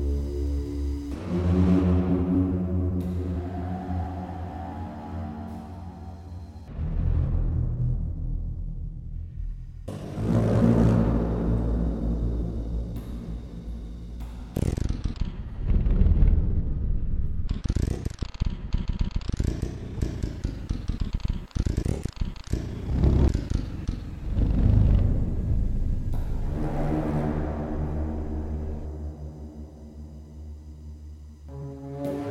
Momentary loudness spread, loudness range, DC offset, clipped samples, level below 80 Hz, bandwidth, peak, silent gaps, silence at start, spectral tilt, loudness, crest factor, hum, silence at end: 17 LU; 9 LU; under 0.1%; under 0.1%; -30 dBFS; 10.5 kHz; -6 dBFS; none; 0 s; -8.5 dB/octave; -28 LUFS; 20 dB; none; 0 s